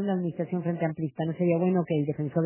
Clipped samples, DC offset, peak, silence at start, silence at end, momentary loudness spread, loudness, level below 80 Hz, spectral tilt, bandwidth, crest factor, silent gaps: under 0.1%; under 0.1%; -12 dBFS; 0 s; 0 s; 5 LU; -28 LUFS; -68 dBFS; -8.5 dB/octave; 3.2 kHz; 14 dB; none